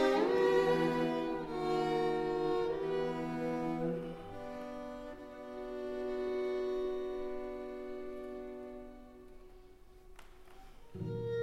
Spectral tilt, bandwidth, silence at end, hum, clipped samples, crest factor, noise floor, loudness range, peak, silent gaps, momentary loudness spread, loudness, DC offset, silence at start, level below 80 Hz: -6.5 dB/octave; 13.5 kHz; 0 s; none; under 0.1%; 18 dB; -56 dBFS; 14 LU; -18 dBFS; none; 17 LU; -36 LUFS; under 0.1%; 0 s; -58 dBFS